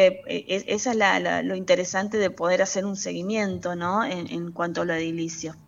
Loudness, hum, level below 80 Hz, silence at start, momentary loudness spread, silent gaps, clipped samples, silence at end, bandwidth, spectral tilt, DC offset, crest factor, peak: -25 LUFS; none; -62 dBFS; 0 s; 9 LU; none; under 0.1%; 0.05 s; 7.8 kHz; -4 dB/octave; under 0.1%; 18 dB; -6 dBFS